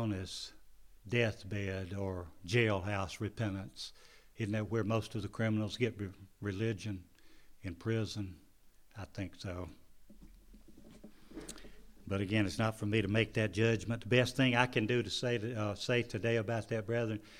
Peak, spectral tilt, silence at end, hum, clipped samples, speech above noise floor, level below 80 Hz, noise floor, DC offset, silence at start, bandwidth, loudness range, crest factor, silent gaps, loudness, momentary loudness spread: -12 dBFS; -6 dB/octave; 0 s; none; under 0.1%; 26 dB; -60 dBFS; -61 dBFS; under 0.1%; 0 s; 15 kHz; 12 LU; 26 dB; none; -35 LUFS; 16 LU